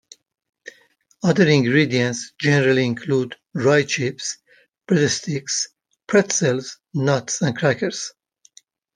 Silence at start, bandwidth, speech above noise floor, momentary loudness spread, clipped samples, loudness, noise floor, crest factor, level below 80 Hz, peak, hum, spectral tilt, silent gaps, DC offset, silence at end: 1.25 s; 10.5 kHz; 38 dB; 12 LU; under 0.1%; -20 LUFS; -58 dBFS; 18 dB; -62 dBFS; -2 dBFS; none; -4.5 dB/octave; none; under 0.1%; 0.85 s